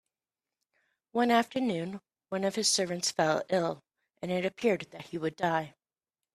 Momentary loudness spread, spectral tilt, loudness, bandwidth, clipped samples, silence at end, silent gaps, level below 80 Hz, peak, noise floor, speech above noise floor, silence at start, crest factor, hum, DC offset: 14 LU; -3.5 dB/octave; -30 LUFS; 15 kHz; under 0.1%; 0.65 s; none; -74 dBFS; -10 dBFS; under -90 dBFS; over 60 dB; 1.15 s; 22 dB; none; under 0.1%